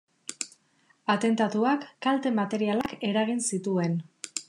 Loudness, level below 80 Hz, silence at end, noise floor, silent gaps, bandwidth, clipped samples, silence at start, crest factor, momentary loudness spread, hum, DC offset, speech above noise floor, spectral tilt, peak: -28 LUFS; -72 dBFS; 0.05 s; -66 dBFS; none; 12 kHz; under 0.1%; 0.3 s; 16 dB; 11 LU; none; under 0.1%; 40 dB; -4.5 dB/octave; -12 dBFS